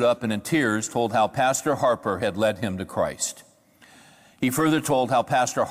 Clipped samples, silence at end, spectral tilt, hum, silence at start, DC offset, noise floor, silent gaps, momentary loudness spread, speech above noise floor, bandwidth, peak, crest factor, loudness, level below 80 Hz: under 0.1%; 0 s; -4.5 dB/octave; none; 0 s; under 0.1%; -55 dBFS; none; 7 LU; 32 dB; 16.5 kHz; -12 dBFS; 12 dB; -24 LUFS; -58 dBFS